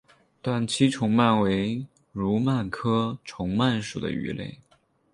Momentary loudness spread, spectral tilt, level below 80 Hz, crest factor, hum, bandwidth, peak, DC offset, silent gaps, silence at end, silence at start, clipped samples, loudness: 13 LU; -6 dB/octave; -54 dBFS; 18 dB; none; 11 kHz; -8 dBFS; under 0.1%; none; 0.6 s; 0.45 s; under 0.1%; -26 LUFS